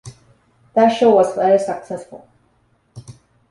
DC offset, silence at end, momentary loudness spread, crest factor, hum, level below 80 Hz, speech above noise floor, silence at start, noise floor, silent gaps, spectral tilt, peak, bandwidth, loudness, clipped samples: under 0.1%; 0.4 s; 16 LU; 16 dB; none; -60 dBFS; 45 dB; 0.05 s; -60 dBFS; none; -6 dB/octave; -2 dBFS; 11.5 kHz; -16 LUFS; under 0.1%